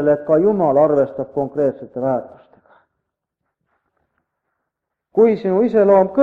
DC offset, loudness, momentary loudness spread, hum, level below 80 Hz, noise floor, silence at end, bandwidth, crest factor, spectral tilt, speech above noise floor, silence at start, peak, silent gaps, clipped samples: under 0.1%; -17 LUFS; 10 LU; none; -60 dBFS; -79 dBFS; 0 s; 4.7 kHz; 16 dB; -10 dB/octave; 64 dB; 0 s; -2 dBFS; none; under 0.1%